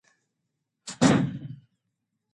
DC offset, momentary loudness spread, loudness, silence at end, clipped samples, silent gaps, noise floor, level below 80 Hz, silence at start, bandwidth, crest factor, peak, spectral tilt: under 0.1%; 22 LU; -24 LUFS; 0.8 s; under 0.1%; none; -81 dBFS; -60 dBFS; 0.85 s; 11.5 kHz; 24 dB; -6 dBFS; -5.5 dB/octave